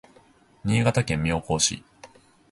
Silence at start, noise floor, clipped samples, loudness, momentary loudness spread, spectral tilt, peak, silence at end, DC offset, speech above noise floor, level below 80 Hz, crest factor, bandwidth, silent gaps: 0.65 s; -57 dBFS; under 0.1%; -24 LUFS; 9 LU; -4 dB/octave; -6 dBFS; 0.45 s; under 0.1%; 33 dB; -46 dBFS; 20 dB; 11.5 kHz; none